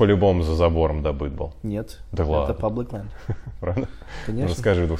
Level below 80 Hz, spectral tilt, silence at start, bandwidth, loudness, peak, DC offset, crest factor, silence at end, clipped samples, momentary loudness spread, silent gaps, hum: -34 dBFS; -7.5 dB/octave; 0 s; 11 kHz; -24 LUFS; -6 dBFS; under 0.1%; 16 dB; 0 s; under 0.1%; 13 LU; none; none